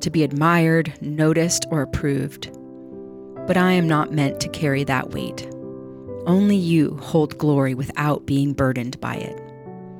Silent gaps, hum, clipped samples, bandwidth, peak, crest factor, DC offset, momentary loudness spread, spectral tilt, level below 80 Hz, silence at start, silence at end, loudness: none; none; under 0.1%; 16.5 kHz; -6 dBFS; 14 dB; under 0.1%; 19 LU; -6 dB/octave; -50 dBFS; 0 s; 0 s; -21 LUFS